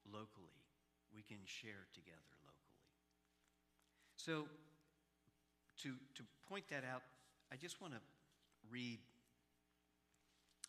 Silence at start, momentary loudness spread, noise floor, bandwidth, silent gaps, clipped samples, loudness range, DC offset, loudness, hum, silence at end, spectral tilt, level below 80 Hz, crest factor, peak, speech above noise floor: 0.05 s; 19 LU; -83 dBFS; 14.5 kHz; none; under 0.1%; 8 LU; under 0.1%; -53 LUFS; none; 0 s; -4 dB/octave; under -90 dBFS; 28 dB; -30 dBFS; 30 dB